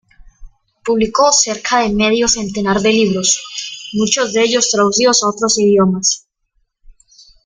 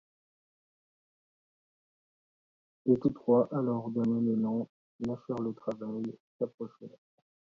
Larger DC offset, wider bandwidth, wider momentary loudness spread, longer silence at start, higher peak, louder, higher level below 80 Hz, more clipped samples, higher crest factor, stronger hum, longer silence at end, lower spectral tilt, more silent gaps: neither; first, 10 kHz vs 5.6 kHz; second, 8 LU vs 16 LU; second, 0.4 s vs 2.85 s; first, 0 dBFS vs -14 dBFS; first, -13 LUFS vs -32 LUFS; first, -44 dBFS vs -70 dBFS; neither; about the same, 16 dB vs 20 dB; neither; first, 1.25 s vs 0.7 s; second, -3 dB/octave vs -10.5 dB/octave; second, none vs 4.69-4.99 s, 6.20-6.39 s, 6.54-6.58 s